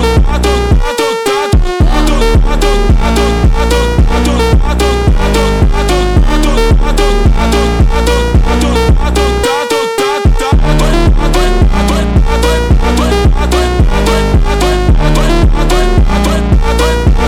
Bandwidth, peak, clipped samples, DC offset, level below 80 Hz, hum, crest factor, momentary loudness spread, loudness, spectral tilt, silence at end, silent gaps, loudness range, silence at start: 14.5 kHz; 0 dBFS; under 0.1%; 0.4%; -10 dBFS; none; 8 dB; 1 LU; -10 LUFS; -5.5 dB/octave; 0 s; none; 0 LU; 0 s